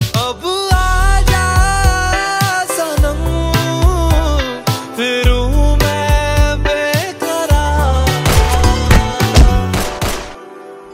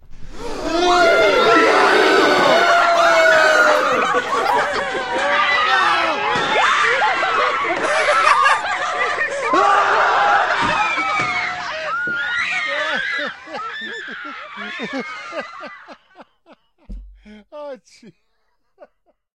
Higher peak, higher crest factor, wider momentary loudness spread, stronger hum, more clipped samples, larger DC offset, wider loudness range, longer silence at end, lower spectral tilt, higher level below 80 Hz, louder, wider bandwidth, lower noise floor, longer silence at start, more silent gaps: about the same, 0 dBFS vs 0 dBFS; second, 12 dB vs 18 dB; second, 6 LU vs 16 LU; neither; neither; neither; second, 2 LU vs 17 LU; second, 0 s vs 1.25 s; first, -4.5 dB/octave vs -2.5 dB/octave; first, -16 dBFS vs -46 dBFS; about the same, -14 LUFS vs -15 LUFS; about the same, 16.5 kHz vs 16 kHz; second, -33 dBFS vs -70 dBFS; about the same, 0 s vs 0.1 s; neither